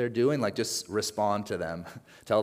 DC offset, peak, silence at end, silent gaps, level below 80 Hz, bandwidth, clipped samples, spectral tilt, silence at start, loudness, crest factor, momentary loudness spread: under 0.1%; -12 dBFS; 0 s; none; -68 dBFS; 16 kHz; under 0.1%; -4.5 dB/octave; 0 s; -29 LUFS; 16 dB; 14 LU